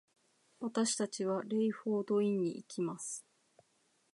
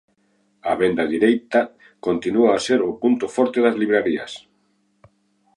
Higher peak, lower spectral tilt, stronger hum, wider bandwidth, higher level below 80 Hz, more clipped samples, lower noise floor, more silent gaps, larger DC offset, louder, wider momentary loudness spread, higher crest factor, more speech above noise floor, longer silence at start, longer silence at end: second, -20 dBFS vs -4 dBFS; about the same, -4.5 dB/octave vs -5 dB/octave; neither; about the same, 11.5 kHz vs 11.5 kHz; second, -90 dBFS vs -60 dBFS; neither; first, -75 dBFS vs -65 dBFS; neither; neither; second, -36 LUFS vs -20 LUFS; about the same, 10 LU vs 11 LU; about the same, 16 dB vs 18 dB; second, 40 dB vs 46 dB; about the same, 0.6 s vs 0.65 s; second, 0.95 s vs 1.2 s